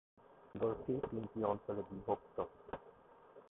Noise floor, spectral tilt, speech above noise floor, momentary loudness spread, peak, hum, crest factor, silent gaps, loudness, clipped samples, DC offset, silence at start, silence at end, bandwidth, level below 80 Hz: -62 dBFS; -5.5 dB/octave; 21 dB; 17 LU; -22 dBFS; none; 20 dB; none; -42 LUFS; under 0.1%; under 0.1%; 0.2 s; 0.05 s; 3.9 kHz; -68 dBFS